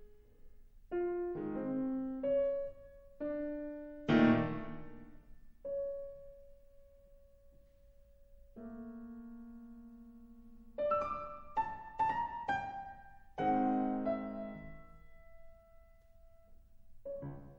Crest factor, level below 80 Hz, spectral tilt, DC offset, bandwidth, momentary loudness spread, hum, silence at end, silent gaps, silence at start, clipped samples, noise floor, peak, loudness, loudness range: 24 dB; -60 dBFS; -8 dB/octave; under 0.1%; 7 kHz; 23 LU; none; 0 s; none; 0 s; under 0.1%; -62 dBFS; -16 dBFS; -37 LUFS; 18 LU